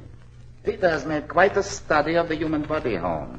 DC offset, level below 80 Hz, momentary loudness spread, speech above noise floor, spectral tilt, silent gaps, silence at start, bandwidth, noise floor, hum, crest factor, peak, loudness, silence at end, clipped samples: under 0.1%; -44 dBFS; 7 LU; 21 dB; -5 dB/octave; none; 0 s; 8.6 kHz; -44 dBFS; none; 20 dB; -4 dBFS; -23 LUFS; 0 s; under 0.1%